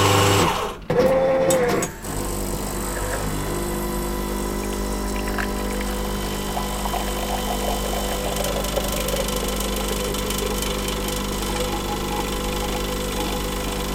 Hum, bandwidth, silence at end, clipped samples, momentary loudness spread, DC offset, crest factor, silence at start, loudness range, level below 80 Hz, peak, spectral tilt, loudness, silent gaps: 50 Hz at -30 dBFS; 17 kHz; 0 s; under 0.1%; 7 LU; under 0.1%; 18 dB; 0 s; 3 LU; -30 dBFS; -6 dBFS; -4 dB/octave; -24 LUFS; none